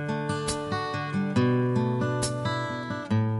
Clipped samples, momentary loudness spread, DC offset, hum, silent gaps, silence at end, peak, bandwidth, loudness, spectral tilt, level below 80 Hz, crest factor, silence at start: under 0.1%; 6 LU; under 0.1%; none; none; 0 s; -12 dBFS; 11.5 kHz; -28 LUFS; -6 dB/octave; -54 dBFS; 14 dB; 0 s